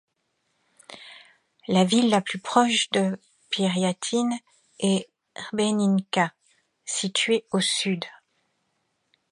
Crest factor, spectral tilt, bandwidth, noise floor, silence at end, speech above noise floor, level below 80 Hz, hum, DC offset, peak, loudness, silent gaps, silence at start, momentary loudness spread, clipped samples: 22 dB; -4 dB/octave; 11.5 kHz; -74 dBFS; 1.2 s; 51 dB; -72 dBFS; none; under 0.1%; -4 dBFS; -24 LUFS; none; 0.9 s; 19 LU; under 0.1%